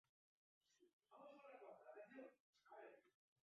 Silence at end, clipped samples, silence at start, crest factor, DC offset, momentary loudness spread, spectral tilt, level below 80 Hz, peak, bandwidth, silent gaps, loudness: 0.35 s; under 0.1%; 0.65 s; 18 dB; under 0.1%; 5 LU; -3 dB/octave; under -90 dBFS; -48 dBFS; 7 kHz; 0.93-0.99 s, 2.40-2.53 s; -64 LUFS